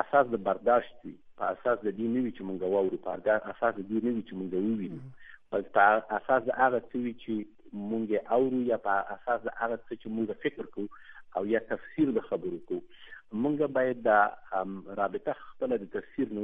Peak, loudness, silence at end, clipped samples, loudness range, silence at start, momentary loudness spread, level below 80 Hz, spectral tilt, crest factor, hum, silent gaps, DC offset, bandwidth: -8 dBFS; -30 LUFS; 0 s; under 0.1%; 4 LU; 0 s; 13 LU; -66 dBFS; -9 dB/octave; 22 dB; none; none; under 0.1%; 3.8 kHz